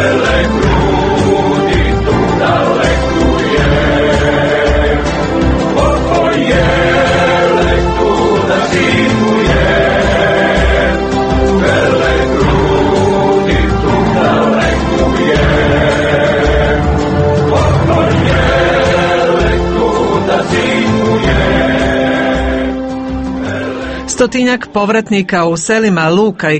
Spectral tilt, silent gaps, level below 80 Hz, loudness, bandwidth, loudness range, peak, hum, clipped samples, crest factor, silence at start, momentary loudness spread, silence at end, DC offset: -6 dB/octave; none; -20 dBFS; -11 LUFS; 8.8 kHz; 2 LU; 0 dBFS; none; under 0.1%; 10 dB; 0 s; 3 LU; 0 s; under 0.1%